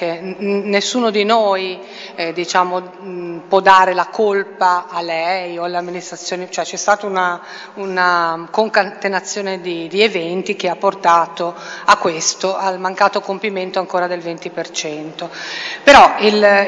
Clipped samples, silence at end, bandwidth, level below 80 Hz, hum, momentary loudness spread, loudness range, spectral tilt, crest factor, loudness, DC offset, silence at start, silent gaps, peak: 0.2%; 0 s; 11 kHz; -52 dBFS; none; 14 LU; 4 LU; -3 dB/octave; 16 dB; -16 LUFS; under 0.1%; 0 s; none; 0 dBFS